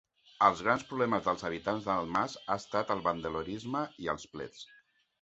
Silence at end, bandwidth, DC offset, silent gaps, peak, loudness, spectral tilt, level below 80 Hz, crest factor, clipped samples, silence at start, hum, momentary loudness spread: 0.6 s; 8.2 kHz; under 0.1%; none; -10 dBFS; -32 LUFS; -5 dB/octave; -62 dBFS; 24 dB; under 0.1%; 0.4 s; none; 13 LU